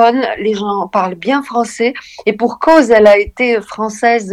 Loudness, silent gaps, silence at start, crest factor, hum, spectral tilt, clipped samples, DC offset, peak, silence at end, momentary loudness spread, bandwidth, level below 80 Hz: -13 LUFS; none; 0 s; 12 dB; none; -4.5 dB/octave; 0.4%; under 0.1%; 0 dBFS; 0 s; 10 LU; 12 kHz; -44 dBFS